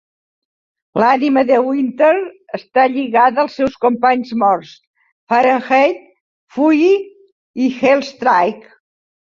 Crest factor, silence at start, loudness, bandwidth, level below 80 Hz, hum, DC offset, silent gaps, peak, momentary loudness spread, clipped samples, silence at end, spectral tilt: 14 dB; 0.95 s; -15 LUFS; 7.4 kHz; -60 dBFS; none; under 0.1%; 4.87-4.94 s, 5.12-5.27 s, 6.20-6.47 s, 7.32-7.54 s; 0 dBFS; 11 LU; under 0.1%; 0.8 s; -6 dB/octave